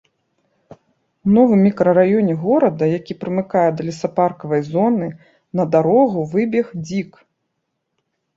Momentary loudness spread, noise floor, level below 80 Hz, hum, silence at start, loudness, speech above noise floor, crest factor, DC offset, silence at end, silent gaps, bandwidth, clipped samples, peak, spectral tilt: 11 LU; -74 dBFS; -58 dBFS; none; 1.25 s; -17 LUFS; 58 dB; 16 dB; under 0.1%; 1.3 s; none; 7.6 kHz; under 0.1%; -2 dBFS; -8.5 dB/octave